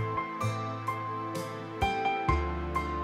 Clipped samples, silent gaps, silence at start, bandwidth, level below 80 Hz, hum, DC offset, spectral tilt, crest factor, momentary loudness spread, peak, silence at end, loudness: under 0.1%; none; 0 s; 15 kHz; -40 dBFS; none; under 0.1%; -6 dB/octave; 18 dB; 7 LU; -14 dBFS; 0 s; -32 LUFS